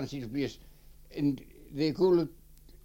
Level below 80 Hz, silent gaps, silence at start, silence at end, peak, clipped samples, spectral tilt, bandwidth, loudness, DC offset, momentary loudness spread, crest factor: -54 dBFS; none; 0 s; 0.1 s; -14 dBFS; under 0.1%; -7.5 dB/octave; 17 kHz; -31 LUFS; under 0.1%; 15 LU; 18 dB